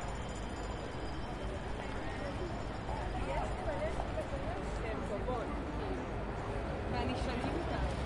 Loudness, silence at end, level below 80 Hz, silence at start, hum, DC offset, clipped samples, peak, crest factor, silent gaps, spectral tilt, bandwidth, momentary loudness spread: -39 LUFS; 0 s; -44 dBFS; 0 s; none; under 0.1%; under 0.1%; -22 dBFS; 14 dB; none; -6.5 dB/octave; 11.5 kHz; 5 LU